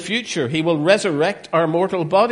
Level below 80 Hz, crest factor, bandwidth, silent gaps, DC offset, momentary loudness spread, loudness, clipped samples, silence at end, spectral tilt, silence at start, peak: -60 dBFS; 18 dB; 11.5 kHz; none; under 0.1%; 5 LU; -19 LUFS; under 0.1%; 0 s; -5 dB/octave; 0 s; 0 dBFS